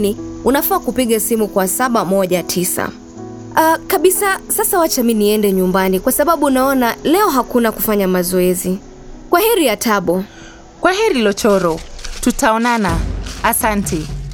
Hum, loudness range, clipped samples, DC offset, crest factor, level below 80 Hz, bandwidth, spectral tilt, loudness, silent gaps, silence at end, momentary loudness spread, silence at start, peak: none; 2 LU; under 0.1%; under 0.1%; 14 dB; -34 dBFS; over 20 kHz; -4 dB/octave; -15 LUFS; none; 0 s; 8 LU; 0 s; 0 dBFS